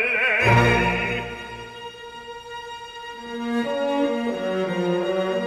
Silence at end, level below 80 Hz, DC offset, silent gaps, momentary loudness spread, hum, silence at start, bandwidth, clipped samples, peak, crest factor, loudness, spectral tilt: 0 s; -44 dBFS; under 0.1%; none; 20 LU; none; 0 s; 14 kHz; under 0.1%; -4 dBFS; 18 dB; -21 LUFS; -6 dB/octave